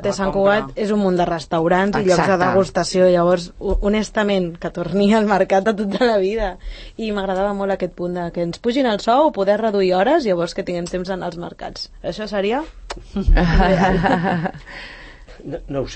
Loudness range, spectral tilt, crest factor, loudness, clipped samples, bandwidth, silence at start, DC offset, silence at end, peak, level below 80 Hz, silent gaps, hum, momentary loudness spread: 4 LU; -6 dB/octave; 16 dB; -19 LUFS; under 0.1%; 8.8 kHz; 0 s; under 0.1%; 0 s; -2 dBFS; -30 dBFS; none; none; 14 LU